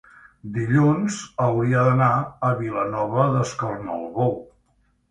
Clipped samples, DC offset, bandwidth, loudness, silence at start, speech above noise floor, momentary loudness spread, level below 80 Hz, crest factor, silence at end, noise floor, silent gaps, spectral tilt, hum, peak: under 0.1%; under 0.1%; 9.4 kHz; -22 LUFS; 0.45 s; 43 dB; 11 LU; -54 dBFS; 18 dB; 0.65 s; -64 dBFS; none; -7.5 dB/octave; none; -4 dBFS